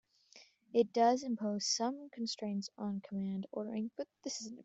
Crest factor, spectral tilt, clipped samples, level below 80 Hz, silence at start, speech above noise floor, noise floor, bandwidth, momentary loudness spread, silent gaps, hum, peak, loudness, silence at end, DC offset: 20 dB; -4 dB/octave; under 0.1%; -82 dBFS; 0.35 s; 27 dB; -63 dBFS; 8.2 kHz; 11 LU; none; none; -18 dBFS; -37 LUFS; 0 s; under 0.1%